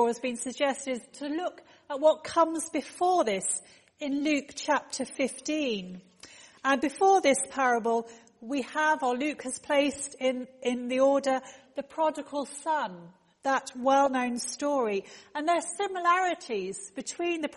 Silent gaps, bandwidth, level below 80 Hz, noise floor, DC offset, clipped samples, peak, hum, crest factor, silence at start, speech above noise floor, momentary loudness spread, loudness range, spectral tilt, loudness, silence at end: none; 11.5 kHz; -72 dBFS; -52 dBFS; under 0.1%; under 0.1%; -12 dBFS; none; 18 dB; 0 s; 24 dB; 12 LU; 3 LU; -2.5 dB/octave; -29 LUFS; 0 s